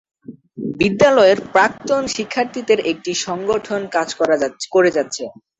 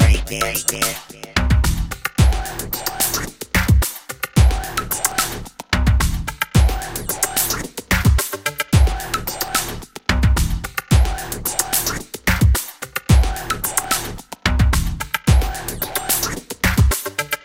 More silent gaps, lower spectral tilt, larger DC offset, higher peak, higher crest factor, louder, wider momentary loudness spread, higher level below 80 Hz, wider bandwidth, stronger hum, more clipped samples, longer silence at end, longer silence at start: neither; about the same, -4 dB/octave vs -4 dB/octave; neither; about the same, -2 dBFS vs 0 dBFS; about the same, 16 dB vs 18 dB; about the same, -17 LUFS vs -19 LUFS; about the same, 9 LU vs 8 LU; second, -54 dBFS vs -22 dBFS; second, 8.4 kHz vs 17 kHz; neither; neither; first, 0.3 s vs 0.05 s; first, 0.3 s vs 0 s